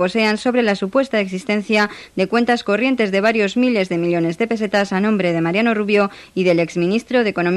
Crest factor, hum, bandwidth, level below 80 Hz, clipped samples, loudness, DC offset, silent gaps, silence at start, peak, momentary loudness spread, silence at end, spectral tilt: 14 dB; none; 12 kHz; -56 dBFS; under 0.1%; -18 LUFS; under 0.1%; none; 0 s; -4 dBFS; 4 LU; 0 s; -6 dB/octave